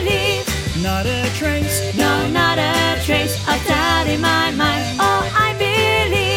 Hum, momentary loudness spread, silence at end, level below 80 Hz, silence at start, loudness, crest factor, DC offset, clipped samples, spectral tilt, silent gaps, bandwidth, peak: none; 4 LU; 0 s; -32 dBFS; 0 s; -17 LUFS; 16 dB; under 0.1%; under 0.1%; -4 dB/octave; none; 17 kHz; -2 dBFS